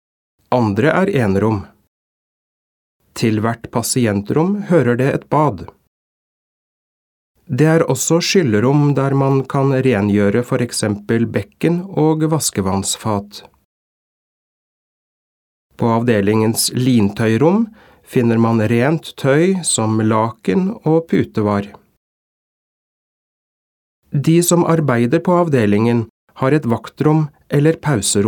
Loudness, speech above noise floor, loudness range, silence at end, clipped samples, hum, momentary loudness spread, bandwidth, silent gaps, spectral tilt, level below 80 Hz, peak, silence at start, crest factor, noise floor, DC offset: -16 LUFS; over 75 dB; 6 LU; 0 s; under 0.1%; none; 6 LU; 18 kHz; 1.87-3.00 s, 5.88-7.35 s, 13.65-15.70 s, 21.97-24.02 s, 26.10-26.27 s; -5.5 dB/octave; -54 dBFS; 0 dBFS; 0.5 s; 16 dB; under -90 dBFS; under 0.1%